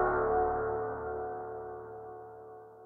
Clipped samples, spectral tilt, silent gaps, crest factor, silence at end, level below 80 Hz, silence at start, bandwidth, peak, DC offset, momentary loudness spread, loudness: under 0.1%; -10.5 dB/octave; none; 16 dB; 0 s; -54 dBFS; 0 s; 2.5 kHz; -18 dBFS; under 0.1%; 19 LU; -34 LUFS